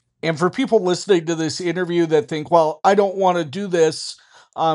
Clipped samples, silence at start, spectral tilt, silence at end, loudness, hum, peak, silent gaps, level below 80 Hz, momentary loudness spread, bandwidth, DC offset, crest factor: under 0.1%; 0.25 s; -5 dB/octave; 0 s; -19 LUFS; none; -2 dBFS; none; -70 dBFS; 7 LU; 11.5 kHz; under 0.1%; 18 dB